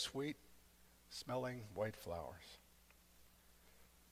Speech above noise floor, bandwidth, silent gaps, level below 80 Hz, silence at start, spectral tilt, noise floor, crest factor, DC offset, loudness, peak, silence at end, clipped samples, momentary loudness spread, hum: 23 dB; 16 kHz; none; -72 dBFS; 0 s; -4.5 dB/octave; -69 dBFS; 20 dB; under 0.1%; -47 LUFS; -28 dBFS; 0 s; under 0.1%; 23 LU; none